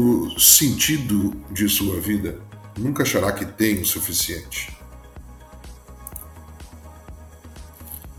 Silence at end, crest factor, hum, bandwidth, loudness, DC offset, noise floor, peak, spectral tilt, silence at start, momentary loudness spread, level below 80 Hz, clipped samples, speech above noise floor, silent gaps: 0.05 s; 22 dB; none; 19.5 kHz; -19 LUFS; under 0.1%; -41 dBFS; 0 dBFS; -3 dB/octave; 0 s; 25 LU; -44 dBFS; under 0.1%; 21 dB; none